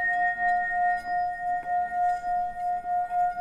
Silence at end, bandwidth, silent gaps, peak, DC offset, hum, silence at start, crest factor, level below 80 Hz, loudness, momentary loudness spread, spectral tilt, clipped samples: 0 s; 9.4 kHz; none; -16 dBFS; under 0.1%; none; 0 s; 10 dB; -54 dBFS; -27 LUFS; 5 LU; -4.5 dB/octave; under 0.1%